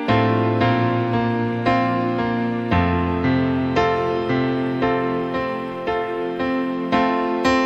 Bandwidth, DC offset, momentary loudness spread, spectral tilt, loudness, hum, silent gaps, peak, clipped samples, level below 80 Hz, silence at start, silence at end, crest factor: 8 kHz; under 0.1%; 5 LU; -7.5 dB/octave; -20 LUFS; none; none; -4 dBFS; under 0.1%; -42 dBFS; 0 s; 0 s; 16 dB